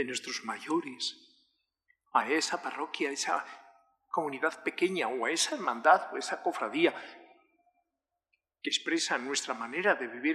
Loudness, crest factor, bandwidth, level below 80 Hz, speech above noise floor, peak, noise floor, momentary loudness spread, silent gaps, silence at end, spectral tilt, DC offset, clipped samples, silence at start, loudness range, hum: -31 LUFS; 24 dB; 13.5 kHz; under -90 dBFS; 56 dB; -10 dBFS; -87 dBFS; 9 LU; none; 0 s; -2 dB/octave; under 0.1%; under 0.1%; 0 s; 4 LU; none